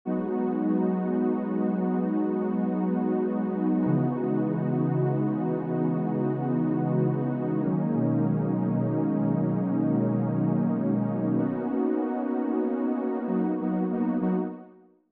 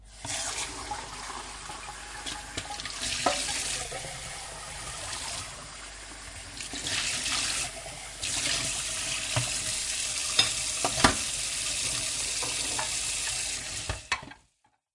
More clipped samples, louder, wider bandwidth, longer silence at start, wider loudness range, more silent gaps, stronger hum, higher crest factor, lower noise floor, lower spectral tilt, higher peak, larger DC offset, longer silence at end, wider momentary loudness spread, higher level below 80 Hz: neither; about the same, -27 LUFS vs -29 LUFS; second, 3.5 kHz vs 11.5 kHz; about the same, 0.05 s vs 0 s; second, 1 LU vs 7 LU; neither; neither; second, 12 dB vs 30 dB; second, -52 dBFS vs -70 dBFS; first, -11 dB/octave vs -1 dB/octave; second, -12 dBFS vs -2 dBFS; neither; about the same, 0.45 s vs 0.55 s; second, 3 LU vs 14 LU; second, -78 dBFS vs -50 dBFS